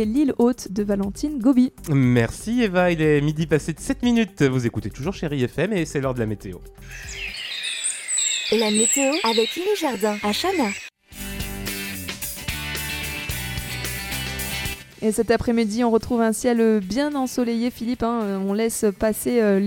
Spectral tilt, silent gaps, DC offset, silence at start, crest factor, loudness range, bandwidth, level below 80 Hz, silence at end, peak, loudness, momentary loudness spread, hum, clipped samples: -4.5 dB/octave; none; under 0.1%; 0 s; 18 dB; 6 LU; 17.5 kHz; -42 dBFS; 0 s; -4 dBFS; -22 LUFS; 10 LU; none; under 0.1%